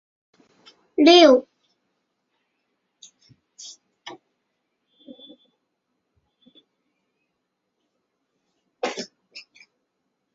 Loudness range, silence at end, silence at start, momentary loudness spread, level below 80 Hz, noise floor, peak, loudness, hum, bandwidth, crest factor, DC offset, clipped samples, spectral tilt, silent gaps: 27 LU; 0.95 s; 1 s; 30 LU; -72 dBFS; -78 dBFS; -2 dBFS; -17 LUFS; none; 7.6 kHz; 24 dB; under 0.1%; under 0.1%; 0 dB/octave; none